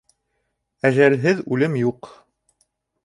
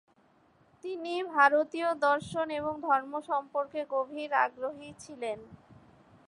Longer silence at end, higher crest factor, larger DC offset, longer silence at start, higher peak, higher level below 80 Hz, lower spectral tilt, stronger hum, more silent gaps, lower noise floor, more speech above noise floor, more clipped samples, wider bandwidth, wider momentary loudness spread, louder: first, 0.95 s vs 0.55 s; about the same, 20 dB vs 22 dB; neither; about the same, 0.85 s vs 0.85 s; first, -2 dBFS vs -10 dBFS; first, -64 dBFS vs -70 dBFS; first, -7.5 dB/octave vs -4.5 dB/octave; neither; neither; first, -74 dBFS vs -65 dBFS; first, 55 dB vs 35 dB; neither; about the same, 11 kHz vs 11.5 kHz; second, 8 LU vs 15 LU; first, -19 LUFS vs -30 LUFS